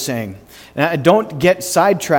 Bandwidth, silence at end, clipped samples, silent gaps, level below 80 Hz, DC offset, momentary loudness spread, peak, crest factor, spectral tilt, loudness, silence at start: 19 kHz; 0 s; under 0.1%; none; -50 dBFS; under 0.1%; 13 LU; 0 dBFS; 16 dB; -4.5 dB/octave; -15 LUFS; 0 s